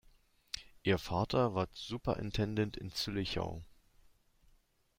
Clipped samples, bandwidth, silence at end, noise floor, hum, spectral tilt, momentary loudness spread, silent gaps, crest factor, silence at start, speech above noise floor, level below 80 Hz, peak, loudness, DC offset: under 0.1%; 16 kHz; 1.35 s; -70 dBFS; none; -6 dB/octave; 12 LU; none; 20 dB; 0.55 s; 35 dB; -56 dBFS; -18 dBFS; -36 LUFS; under 0.1%